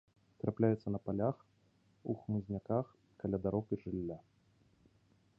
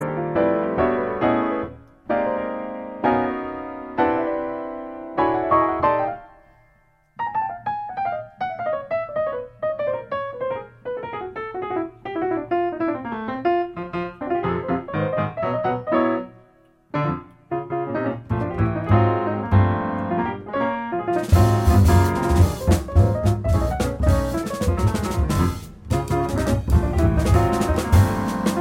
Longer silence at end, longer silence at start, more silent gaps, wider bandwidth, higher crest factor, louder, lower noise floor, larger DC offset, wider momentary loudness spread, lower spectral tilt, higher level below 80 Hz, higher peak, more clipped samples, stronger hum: first, 1.2 s vs 0 s; first, 0.45 s vs 0 s; neither; second, 5.4 kHz vs 16.5 kHz; about the same, 22 dB vs 18 dB; second, -38 LUFS vs -22 LUFS; first, -72 dBFS vs -59 dBFS; neither; about the same, 13 LU vs 11 LU; first, -10.5 dB/octave vs -7.5 dB/octave; second, -64 dBFS vs -32 dBFS; second, -16 dBFS vs -4 dBFS; neither; neither